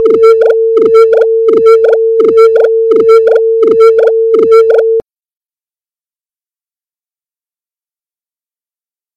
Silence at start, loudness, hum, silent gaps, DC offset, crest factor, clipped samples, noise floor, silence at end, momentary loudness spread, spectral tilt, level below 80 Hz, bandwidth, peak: 0 s; -6 LUFS; none; none; under 0.1%; 8 dB; under 0.1%; under -90 dBFS; 4.15 s; 3 LU; -5.5 dB/octave; -56 dBFS; 6.8 kHz; 0 dBFS